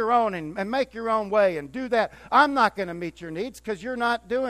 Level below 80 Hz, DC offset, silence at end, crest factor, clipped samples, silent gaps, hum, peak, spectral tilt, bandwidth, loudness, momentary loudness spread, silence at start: -56 dBFS; under 0.1%; 0 s; 20 dB; under 0.1%; none; none; -6 dBFS; -5 dB/octave; 15 kHz; -25 LUFS; 12 LU; 0 s